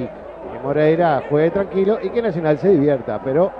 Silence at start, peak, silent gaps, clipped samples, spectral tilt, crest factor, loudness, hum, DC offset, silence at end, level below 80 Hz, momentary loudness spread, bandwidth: 0 s; -4 dBFS; none; under 0.1%; -9.5 dB/octave; 14 dB; -18 LUFS; none; under 0.1%; 0 s; -50 dBFS; 12 LU; 5.8 kHz